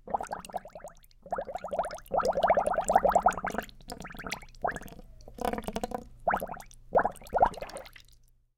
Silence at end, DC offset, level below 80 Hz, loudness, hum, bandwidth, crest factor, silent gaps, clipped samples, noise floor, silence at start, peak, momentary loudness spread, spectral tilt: 0.6 s; under 0.1%; -50 dBFS; -31 LUFS; none; 17 kHz; 22 dB; none; under 0.1%; -60 dBFS; 0.05 s; -10 dBFS; 19 LU; -4.5 dB/octave